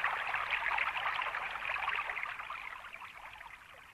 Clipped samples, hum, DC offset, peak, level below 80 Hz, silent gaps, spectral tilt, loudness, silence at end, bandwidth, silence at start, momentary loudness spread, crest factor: under 0.1%; none; under 0.1%; -20 dBFS; -66 dBFS; none; -1.5 dB/octave; -35 LUFS; 0 s; 14 kHz; 0 s; 16 LU; 18 dB